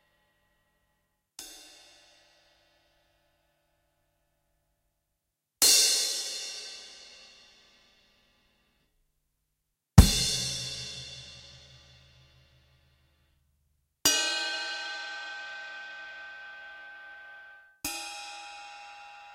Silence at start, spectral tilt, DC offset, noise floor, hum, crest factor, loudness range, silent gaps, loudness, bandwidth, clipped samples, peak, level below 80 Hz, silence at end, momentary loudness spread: 1.4 s; -2.5 dB/octave; under 0.1%; -83 dBFS; none; 32 dB; 14 LU; none; -26 LUFS; 16 kHz; under 0.1%; -2 dBFS; -40 dBFS; 0 s; 26 LU